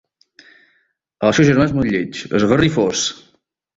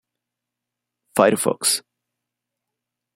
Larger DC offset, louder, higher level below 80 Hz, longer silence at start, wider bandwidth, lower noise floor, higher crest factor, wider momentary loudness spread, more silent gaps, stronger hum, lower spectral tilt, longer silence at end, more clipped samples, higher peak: neither; first, -16 LUFS vs -19 LUFS; first, -44 dBFS vs -72 dBFS; about the same, 1.2 s vs 1.15 s; second, 7.8 kHz vs 16 kHz; second, -64 dBFS vs -84 dBFS; second, 16 dB vs 22 dB; about the same, 8 LU vs 7 LU; neither; neither; first, -5 dB/octave vs -2.5 dB/octave; second, 0.6 s vs 1.35 s; neither; about the same, -2 dBFS vs -2 dBFS